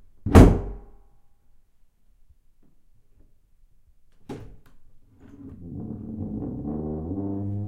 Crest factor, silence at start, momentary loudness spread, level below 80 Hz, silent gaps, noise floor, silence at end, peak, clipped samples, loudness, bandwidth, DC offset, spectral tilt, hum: 26 dB; 0.2 s; 28 LU; -32 dBFS; none; -56 dBFS; 0 s; 0 dBFS; under 0.1%; -22 LUFS; 15 kHz; under 0.1%; -8 dB/octave; none